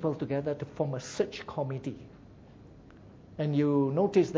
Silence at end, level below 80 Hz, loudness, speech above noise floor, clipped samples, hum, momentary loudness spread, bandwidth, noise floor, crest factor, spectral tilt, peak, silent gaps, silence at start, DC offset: 0 s; -62 dBFS; -31 LUFS; 23 dB; under 0.1%; none; 15 LU; 8 kHz; -52 dBFS; 18 dB; -7.5 dB/octave; -12 dBFS; none; 0 s; under 0.1%